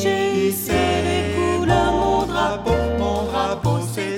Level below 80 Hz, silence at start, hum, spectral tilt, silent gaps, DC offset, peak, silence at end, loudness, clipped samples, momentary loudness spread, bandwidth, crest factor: -34 dBFS; 0 s; none; -5.5 dB/octave; none; under 0.1%; -4 dBFS; 0 s; -20 LUFS; under 0.1%; 4 LU; 17 kHz; 14 dB